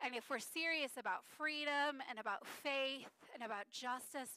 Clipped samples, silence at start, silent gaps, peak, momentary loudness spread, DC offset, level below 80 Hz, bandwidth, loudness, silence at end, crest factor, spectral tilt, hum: under 0.1%; 0 s; none; -28 dBFS; 8 LU; under 0.1%; under -90 dBFS; 15.5 kHz; -42 LUFS; 0 s; 16 dB; -1 dB/octave; none